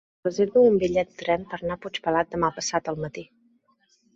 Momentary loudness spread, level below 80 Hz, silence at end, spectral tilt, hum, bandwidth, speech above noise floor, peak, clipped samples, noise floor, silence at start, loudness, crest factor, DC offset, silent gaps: 13 LU; -56 dBFS; 0.9 s; -5 dB/octave; none; 8 kHz; 42 dB; -8 dBFS; under 0.1%; -66 dBFS; 0.25 s; -24 LUFS; 18 dB; under 0.1%; none